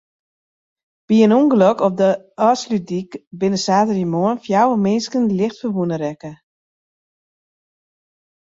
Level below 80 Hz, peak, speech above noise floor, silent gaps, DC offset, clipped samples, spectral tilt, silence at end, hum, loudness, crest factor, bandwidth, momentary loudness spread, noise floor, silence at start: -62 dBFS; -2 dBFS; over 73 dB; 3.27-3.31 s; under 0.1%; under 0.1%; -6.5 dB/octave; 2.2 s; none; -17 LUFS; 16 dB; 7.8 kHz; 12 LU; under -90 dBFS; 1.1 s